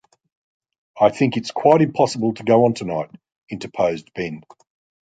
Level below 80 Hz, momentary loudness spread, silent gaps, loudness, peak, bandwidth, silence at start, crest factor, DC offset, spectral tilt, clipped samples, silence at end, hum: -60 dBFS; 16 LU; 3.36-3.47 s; -19 LUFS; -2 dBFS; 9.2 kHz; 0.95 s; 20 dB; under 0.1%; -6.5 dB/octave; under 0.1%; 0.65 s; none